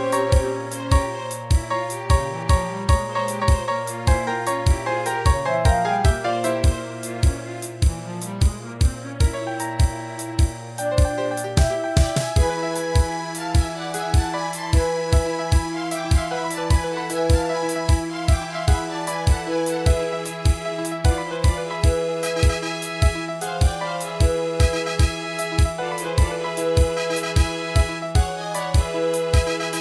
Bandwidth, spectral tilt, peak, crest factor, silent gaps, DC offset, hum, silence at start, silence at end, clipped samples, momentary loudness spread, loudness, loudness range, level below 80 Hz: 11 kHz; -5 dB/octave; -4 dBFS; 16 dB; none; under 0.1%; none; 0 s; 0 s; under 0.1%; 6 LU; -22 LUFS; 2 LU; -24 dBFS